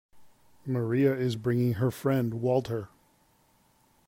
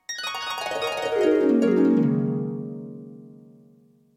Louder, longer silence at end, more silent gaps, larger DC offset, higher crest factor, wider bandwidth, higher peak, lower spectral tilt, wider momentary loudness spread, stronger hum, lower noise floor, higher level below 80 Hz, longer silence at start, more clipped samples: second, -28 LUFS vs -23 LUFS; first, 1.2 s vs 0.85 s; neither; neither; about the same, 16 dB vs 16 dB; about the same, 16 kHz vs 16 kHz; about the same, -12 dBFS vs -10 dBFS; first, -8 dB/octave vs -6 dB/octave; second, 11 LU vs 18 LU; neither; first, -66 dBFS vs -56 dBFS; about the same, -64 dBFS vs -68 dBFS; about the same, 0.15 s vs 0.1 s; neither